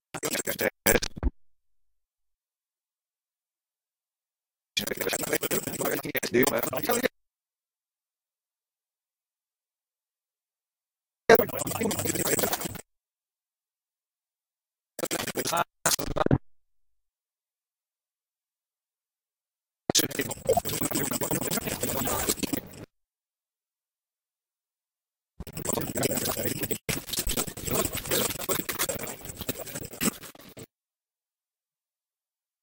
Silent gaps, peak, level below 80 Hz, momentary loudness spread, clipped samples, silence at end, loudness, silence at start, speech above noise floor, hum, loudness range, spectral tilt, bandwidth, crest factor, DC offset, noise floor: none; -4 dBFS; -48 dBFS; 11 LU; under 0.1%; 1.95 s; -27 LUFS; 0.15 s; over 63 dB; none; 9 LU; -3 dB/octave; 19 kHz; 28 dB; under 0.1%; under -90 dBFS